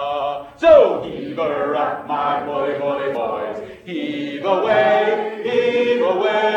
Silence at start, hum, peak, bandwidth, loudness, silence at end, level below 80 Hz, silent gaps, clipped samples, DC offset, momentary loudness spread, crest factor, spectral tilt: 0 s; none; 0 dBFS; 8.2 kHz; -18 LUFS; 0 s; -56 dBFS; none; under 0.1%; under 0.1%; 13 LU; 18 dB; -6 dB/octave